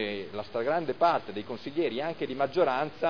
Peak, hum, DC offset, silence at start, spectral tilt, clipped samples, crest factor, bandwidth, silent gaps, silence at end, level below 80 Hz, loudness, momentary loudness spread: -12 dBFS; none; 0.4%; 0 s; -7 dB/octave; under 0.1%; 18 dB; 5.4 kHz; none; 0 s; -68 dBFS; -30 LUFS; 10 LU